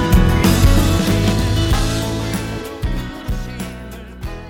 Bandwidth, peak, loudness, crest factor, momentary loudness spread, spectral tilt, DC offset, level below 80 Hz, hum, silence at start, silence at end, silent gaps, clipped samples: 18 kHz; -2 dBFS; -18 LUFS; 14 dB; 16 LU; -5.5 dB/octave; under 0.1%; -20 dBFS; none; 0 s; 0 s; none; under 0.1%